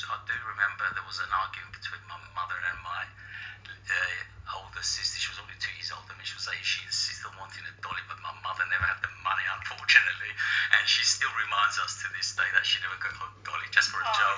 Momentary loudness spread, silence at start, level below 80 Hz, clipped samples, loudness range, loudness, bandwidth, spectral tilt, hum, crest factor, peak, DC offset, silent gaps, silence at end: 17 LU; 0 s; -58 dBFS; under 0.1%; 9 LU; -28 LUFS; 7.8 kHz; 0.5 dB/octave; none; 28 dB; -2 dBFS; under 0.1%; none; 0 s